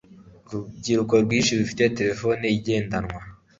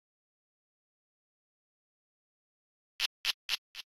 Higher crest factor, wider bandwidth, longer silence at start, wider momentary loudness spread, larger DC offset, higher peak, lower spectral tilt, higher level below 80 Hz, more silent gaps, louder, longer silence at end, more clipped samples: second, 20 dB vs 30 dB; second, 7.8 kHz vs 16 kHz; second, 0.25 s vs 3 s; first, 15 LU vs 5 LU; neither; first, -4 dBFS vs -14 dBFS; first, -5 dB/octave vs 3 dB/octave; first, -50 dBFS vs -74 dBFS; second, none vs 3.06-3.24 s, 3.34-3.49 s, 3.58-3.74 s; first, -23 LUFS vs -34 LUFS; about the same, 0.25 s vs 0.2 s; neither